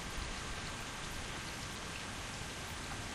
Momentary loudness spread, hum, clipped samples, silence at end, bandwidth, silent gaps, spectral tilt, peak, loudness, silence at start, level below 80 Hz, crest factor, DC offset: 1 LU; none; under 0.1%; 0 s; 15.5 kHz; none; -3 dB/octave; -28 dBFS; -42 LUFS; 0 s; -50 dBFS; 14 dB; under 0.1%